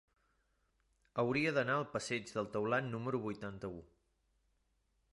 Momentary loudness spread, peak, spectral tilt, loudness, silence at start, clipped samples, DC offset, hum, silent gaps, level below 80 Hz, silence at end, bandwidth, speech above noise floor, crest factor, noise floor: 12 LU; -20 dBFS; -5.5 dB/octave; -38 LUFS; 1.15 s; under 0.1%; under 0.1%; none; none; -70 dBFS; 1.25 s; 11.5 kHz; 41 dB; 20 dB; -79 dBFS